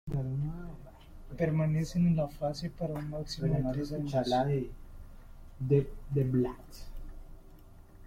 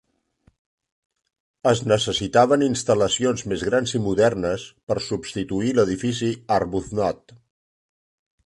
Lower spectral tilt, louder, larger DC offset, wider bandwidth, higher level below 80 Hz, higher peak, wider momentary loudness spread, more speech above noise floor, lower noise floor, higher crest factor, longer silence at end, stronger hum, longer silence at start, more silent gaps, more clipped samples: first, -8 dB/octave vs -5 dB/octave; second, -32 LUFS vs -22 LUFS; neither; first, 15 kHz vs 11.5 kHz; about the same, -46 dBFS vs -50 dBFS; second, -14 dBFS vs -4 dBFS; first, 21 LU vs 9 LU; second, 22 dB vs 41 dB; second, -52 dBFS vs -63 dBFS; about the same, 18 dB vs 20 dB; second, 0 s vs 1.1 s; neither; second, 0.05 s vs 1.65 s; second, none vs 4.83-4.87 s; neither